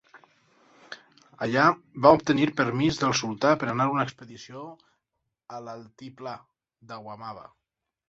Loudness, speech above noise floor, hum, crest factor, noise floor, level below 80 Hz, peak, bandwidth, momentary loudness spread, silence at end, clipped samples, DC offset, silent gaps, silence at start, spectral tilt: -23 LUFS; 56 dB; none; 24 dB; -82 dBFS; -62 dBFS; -2 dBFS; 8 kHz; 24 LU; 0.65 s; under 0.1%; under 0.1%; none; 0.15 s; -5 dB/octave